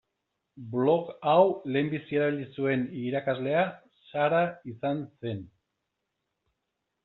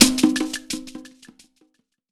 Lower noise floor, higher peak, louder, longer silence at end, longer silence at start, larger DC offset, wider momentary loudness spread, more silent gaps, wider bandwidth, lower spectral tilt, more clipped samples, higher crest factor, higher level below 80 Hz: first, -83 dBFS vs -65 dBFS; second, -10 dBFS vs 0 dBFS; second, -28 LUFS vs -21 LUFS; first, 1.6 s vs 1.05 s; first, 0.55 s vs 0 s; neither; second, 13 LU vs 22 LU; neither; second, 4.2 kHz vs over 20 kHz; first, -5.5 dB/octave vs -2 dB/octave; neither; about the same, 20 dB vs 22 dB; second, -72 dBFS vs -50 dBFS